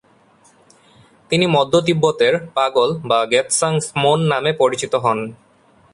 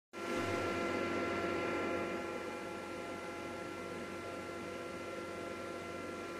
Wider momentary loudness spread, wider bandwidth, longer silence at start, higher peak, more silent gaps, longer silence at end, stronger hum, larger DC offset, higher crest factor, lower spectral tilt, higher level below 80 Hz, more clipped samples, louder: second, 4 LU vs 7 LU; second, 11.5 kHz vs 14.5 kHz; first, 1.3 s vs 0.15 s; first, -2 dBFS vs -24 dBFS; neither; first, 0.6 s vs 0 s; neither; neither; about the same, 16 dB vs 16 dB; about the same, -4 dB/octave vs -5 dB/octave; first, -58 dBFS vs -70 dBFS; neither; first, -17 LUFS vs -40 LUFS